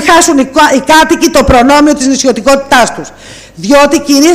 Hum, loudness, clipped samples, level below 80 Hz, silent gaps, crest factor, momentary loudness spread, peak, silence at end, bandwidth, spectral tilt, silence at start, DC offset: none; -6 LUFS; 0.4%; -26 dBFS; none; 6 dB; 5 LU; 0 dBFS; 0 s; 16 kHz; -3 dB/octave; 0 s; under 0.1%